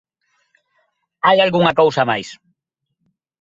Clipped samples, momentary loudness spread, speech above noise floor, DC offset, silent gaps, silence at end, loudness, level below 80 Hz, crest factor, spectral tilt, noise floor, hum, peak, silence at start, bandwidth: under 0.1%; 9 LU; 61 dB; under 0.1%; none; 1.05 s; -15 LUFS; -60 dBFS; 18 dB; -5.5 dB/octave; -76 dBFS; none; 0 dBFS; 1.25 s; 7.8 kHz